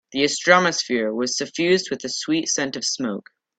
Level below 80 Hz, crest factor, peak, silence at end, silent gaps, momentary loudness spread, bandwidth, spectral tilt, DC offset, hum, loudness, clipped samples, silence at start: -66 dBFS; 22 dB; 0 dBFS; 0.4 s; none; 10 LU; 9.2 kHz; -2.5 dB/octave; under 0.1%; none; -21 LUFS; under 0.1%; 0.1 s